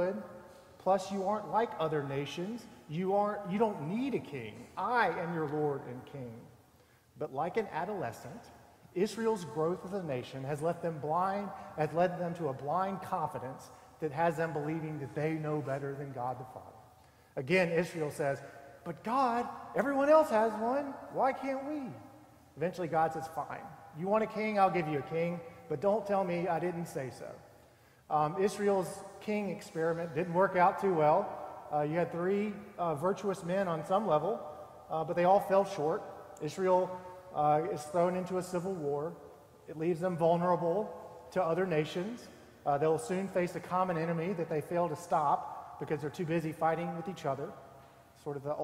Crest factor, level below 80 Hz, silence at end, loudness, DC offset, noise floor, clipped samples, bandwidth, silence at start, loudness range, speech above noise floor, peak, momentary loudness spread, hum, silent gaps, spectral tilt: 20 dB; -70 dBFS; 0 s; -33 LUFS; under 0.1%; -64 dBFS; under 0.1%; 16 kHz; 0 s; 5 LU; 31 dB; -14 dBFS; 14 LU; none; none; -6.5 dB/octave